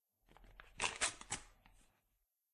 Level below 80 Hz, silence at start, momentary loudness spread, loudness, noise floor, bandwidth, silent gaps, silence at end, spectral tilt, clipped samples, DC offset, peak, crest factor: -66 dBFS; 0.4 s; 24 LU; -41 LUFS; -85 dBFS; 13 kHz; none; 1.05 s; 0 dB/octave; under 0.1%; under 0.1%; -20 dBFS; 28 dB